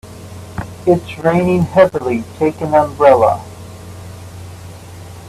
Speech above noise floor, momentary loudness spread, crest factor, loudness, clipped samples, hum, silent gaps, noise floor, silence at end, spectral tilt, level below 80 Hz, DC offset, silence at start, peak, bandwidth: 20 dB; 23 LU; 16 dB; -14 LUFS; under 0.1%; none; none; -33 dBFS; 0 s; -7.5 dB/octave; -44 dBFS; under 0.1%; 0.05 s; 0 dBFS; 14 kHz